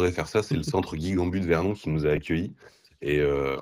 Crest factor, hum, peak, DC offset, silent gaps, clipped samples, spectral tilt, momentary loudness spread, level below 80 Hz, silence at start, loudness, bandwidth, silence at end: 16 dB; none; -10 dBFS; under 0.1%; none; under 0.1%; -6.5 dB/octave; 5 LU; -44 dBFS; 0 s; -27 LUFS; 14.5 kHz; 0 s